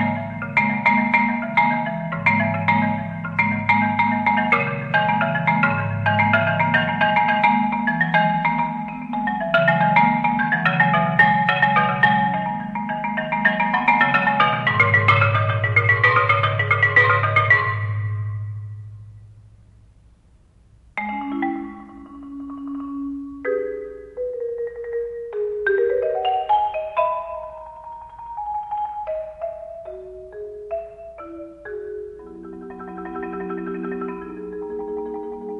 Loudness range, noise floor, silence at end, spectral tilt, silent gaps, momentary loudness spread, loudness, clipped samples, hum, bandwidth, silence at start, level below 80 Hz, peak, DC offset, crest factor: 15 LU; -53 dBFS; 0 s; -8 dB/octave; none; 19 LU; -19 LUFS; under 0.1%; none; 7.4 kHz; 0 s; -52 dBFS; -4 dBFS; under 0.1%; 18 dB